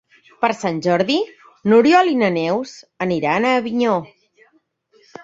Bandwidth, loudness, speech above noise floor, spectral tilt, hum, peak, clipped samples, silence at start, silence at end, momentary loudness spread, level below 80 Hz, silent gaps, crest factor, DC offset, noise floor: 8 kHz; -18 LUFS; 43 dB; -5.5 dB/octave; none; -2 dBFS; under 0.1%; 0.4 s; 1.2 s; 11 LU; -62 dBFS; none; 16 dB; under 0.1%; -61 dBFS